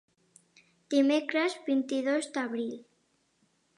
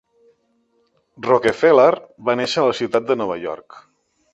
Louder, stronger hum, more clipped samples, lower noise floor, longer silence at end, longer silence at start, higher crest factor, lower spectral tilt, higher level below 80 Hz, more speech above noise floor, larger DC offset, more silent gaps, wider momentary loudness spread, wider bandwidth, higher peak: second, -29 LUFS vs -18 LUFS; neither; neither; first, -72 dBFS vs -64 dBFS; first, 0.95 s vs 0.55 s; second, 0.9 s vs 1.2 s; about the same, 18 dB vs 18 dB; second, -3.5 dB/octave vs -5 dB/octave; second, -88 dBFS vs -62 dBFS; about the same, 44 dB vs 46 dB; neither; neither; second, 10 LU vs 15 LU; about the same, 11 kHz vs 10.5 kHz; second, -14 dBFS vs -2 dBFS